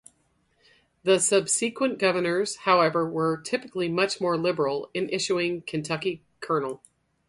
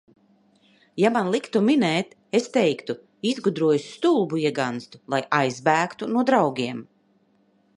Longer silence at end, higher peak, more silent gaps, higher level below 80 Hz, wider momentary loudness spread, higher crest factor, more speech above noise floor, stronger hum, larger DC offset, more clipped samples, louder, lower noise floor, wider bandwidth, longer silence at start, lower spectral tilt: second, 0.5 s vs 0.95 s; about the same, -6 dBFS vs -4 dBFS; neither; first, -68 dBFS vs -74 dBFS; about the same, 9 LU vs 9 LU; about the same, 20 dB vs 20 dB; about the same, 43 dB vs 41 dB; neither; neither; neither; about the same, -25 LUFS vs -23 LUFS; first, -68 dBFS vs -63 dBFS; about the same, 11.5 kHz vs 11.5 kHz; about the same, 1.05 s vs 0.95 s; second, -3.5 dB/octave vs -5.5 dB/octave